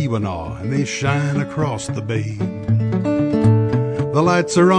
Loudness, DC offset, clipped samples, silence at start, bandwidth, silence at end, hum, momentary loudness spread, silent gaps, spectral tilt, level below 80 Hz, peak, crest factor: -19 LUFS; under 0.1%; under 0.1%; 0 s; 10 kHz; 0 s; none; 9 LU; none; -6.5 dB/octave; -44 dBFS; -4 dBFS; 14 dB